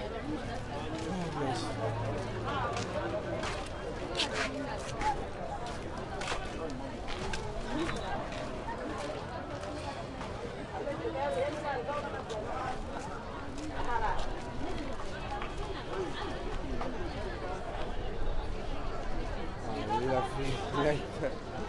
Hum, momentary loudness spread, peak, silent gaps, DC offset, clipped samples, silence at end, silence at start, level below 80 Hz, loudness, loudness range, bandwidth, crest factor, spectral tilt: none; 7 LU; -16 dBFS; none; under 0.1%; under 0.1%; 0 s; 0 s; -42 dBFS; -37 LUFS; 4 LU; 11.5 kHz; 18 dB; -5 dB/octave